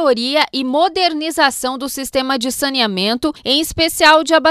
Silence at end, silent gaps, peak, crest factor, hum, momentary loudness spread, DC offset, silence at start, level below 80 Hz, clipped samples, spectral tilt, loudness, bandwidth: 0 s; none; 0 dBFS; 16 dB; none; 9 LU; under 0.1%; 0 s; -46 dBFS; under 0.1%; -2.5 dB/octave; -15 LUFS; 16 kHz